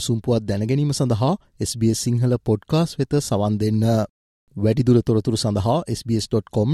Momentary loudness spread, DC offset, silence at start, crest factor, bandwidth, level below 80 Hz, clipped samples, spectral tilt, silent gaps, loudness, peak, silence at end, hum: 6 LU; under 0.1%; 0 s; 14 dB; 13 kHz; -48 dBFS; under 0.1%; -6.5 dB/octave; 4.09-4.47 s; -21 LUFS; -6 dBFS; 0 s; none